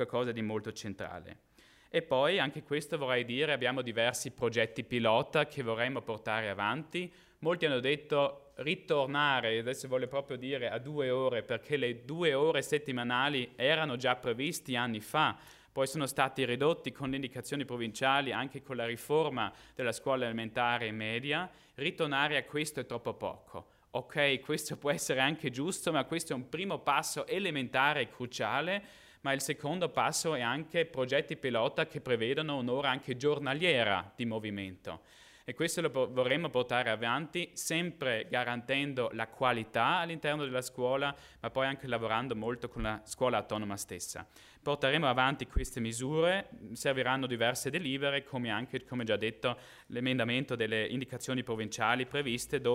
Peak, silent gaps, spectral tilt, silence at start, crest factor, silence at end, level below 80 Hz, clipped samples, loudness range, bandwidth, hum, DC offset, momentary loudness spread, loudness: -12 dBFS; none; -4 dB/octave; 0 s; 22 dB; 0 s; -56 dBFS; under 0.1%; 2 LU; 16 kHz; none; under 0.1%; 9 LU; -33 LUFS